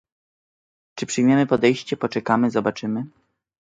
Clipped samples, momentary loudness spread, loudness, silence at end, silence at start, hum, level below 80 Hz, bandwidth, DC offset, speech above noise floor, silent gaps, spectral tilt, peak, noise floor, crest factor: under 0.1%; 14 LU; -21 LUFS; 0.55 s; 0.95 s; none; -62 dBFS; 9.2 kHz; under 0.1%; over 70 dB; none; -5.5 dB/octave; -4 dBFS; under -90 dBFS; 20 dB